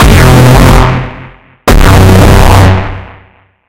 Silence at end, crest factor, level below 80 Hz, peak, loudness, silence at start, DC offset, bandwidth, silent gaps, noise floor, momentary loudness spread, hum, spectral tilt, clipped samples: 0.5 s; 4 dB; -10 dBFS; 0 dBFS; -4 LUFS; 0 s; under 0.1%; 17 kHz; none; -41 dBFS; 14 LU; none; -6 dB/octave; 4%